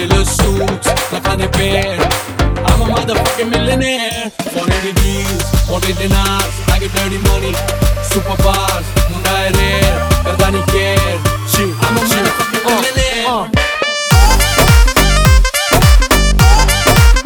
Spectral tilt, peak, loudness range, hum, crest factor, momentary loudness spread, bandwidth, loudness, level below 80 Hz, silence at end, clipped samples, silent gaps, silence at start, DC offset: -4 dB/octave; 0 dBFS; 5 LU; none; 12 dB; 6 LU; over 20 kHz; -13 LUFS; -16 dBFS; 0 s; 0.1%; none; 0 s; under 0.1%